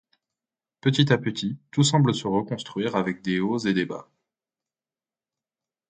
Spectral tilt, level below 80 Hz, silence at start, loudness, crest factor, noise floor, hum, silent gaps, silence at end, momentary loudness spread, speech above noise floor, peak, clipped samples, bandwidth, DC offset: -5.5 dB/octave; -62 dBFS; 0.85 s; -24 LUFS; 22 dB; under -90 dBFS; none; none; 1.85 s; 10 LU; over 66 dB; -4 dBFS; under 0.1%; 9.4 kHz; under 0.1%